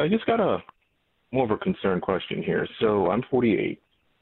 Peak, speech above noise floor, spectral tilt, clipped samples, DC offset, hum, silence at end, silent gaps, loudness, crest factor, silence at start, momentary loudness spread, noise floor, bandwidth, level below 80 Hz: -8 dBFS; 46 dB; -10.5 dB/octave; under 0.1%; under 0.1%; none; 0.45 s; none; -25 LUFS; 16 dB; 0 s; 7 LU; -70 dBFS; 4.2 kHz; -56 dBFS